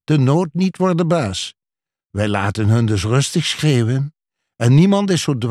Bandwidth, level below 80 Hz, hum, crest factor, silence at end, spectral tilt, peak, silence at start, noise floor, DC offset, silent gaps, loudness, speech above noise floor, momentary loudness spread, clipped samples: 13 kHz; -50 dBFS; none; 14 dB; 0 s; -6 dB/octave; -2 dBFS; 0.1 s; -90 dBFS; under 0.1%; none; -17 LUFS; 74 dB; 9 LU; under 0.1%